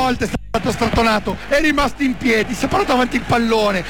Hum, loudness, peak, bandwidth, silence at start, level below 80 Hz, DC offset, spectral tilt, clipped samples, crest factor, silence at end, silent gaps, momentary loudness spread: none; -17 LUFS; -6 dBFS; 20 kHz; 0 s; -32 dBFS; 2%; -5 dB/octave; under 0.1%; 12 dB; 0 s; none; 6 LU